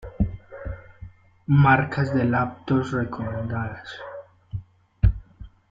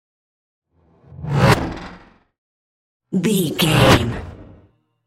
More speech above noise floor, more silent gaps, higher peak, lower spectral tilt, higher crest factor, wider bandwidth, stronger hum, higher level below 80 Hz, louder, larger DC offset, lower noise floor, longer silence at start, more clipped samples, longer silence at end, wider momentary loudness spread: second, 23 dB vs 38 dB; second, none vs 2.38-3.00 s; second, -4 dBFS vs 0 dBFS; first, -8.5 dB/octave vs -5 dB/octave; about the same, 20 dB vs 20 dB; second, 7.6 kHz vs 16.5 kHz; neither; about the same, -34 dBFS vs -38 dBFS; second, -23 LUFS vs -17 LUFS; neither; second, -45 dBFS vs -54 dBFS; second, 0 s vs 1.2 s; neither; second, 0.25 s vs 0.65 s; about the same, 20 LU vs 21 LU